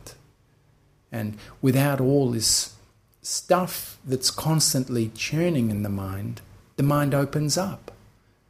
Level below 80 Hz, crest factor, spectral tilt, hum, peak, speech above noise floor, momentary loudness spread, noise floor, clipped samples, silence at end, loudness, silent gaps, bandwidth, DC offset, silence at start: -54 dBFS; 20 dB; -4.5 dB/octave; none; -6 dBFS; 37 dB; 13 LU; -61 dBFS; under 0.1%; 0.6 s; -24 LUFS; none; 15.5 kHz; under 0.1%; 0.05 s